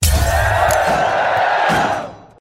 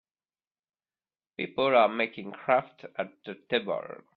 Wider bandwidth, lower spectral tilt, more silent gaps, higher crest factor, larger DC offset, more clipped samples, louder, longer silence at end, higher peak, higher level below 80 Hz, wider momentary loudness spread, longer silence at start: first, 16.5 kHz vs 4.9 kHz; second, -4 dB/octave vs -7.5 dB/octave; neither; second, 14 dB vs 22 dB; neither; neither; first, -15 LUFS vs -28 LUFS; about the same, 0.2 s vs 0.2 s; first, -2 dBFS vs -8 dBFS; first, -24 dBFS vs -74 dBFS; second, 6 LU vs 16 LU; second, 0 s vs 1.4 s